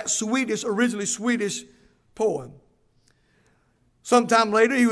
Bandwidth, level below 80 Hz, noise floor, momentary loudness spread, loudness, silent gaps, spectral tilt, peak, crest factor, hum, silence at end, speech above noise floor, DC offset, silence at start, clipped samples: 11 kHz; -66 dBFS; -64 dBFS; 11 LU; -23 LUFS; none; -3 dB/octave; -4 dBFS; 20 dB; none; 0 s; 42 dB; under 0.1%; 0 s; under 0.1%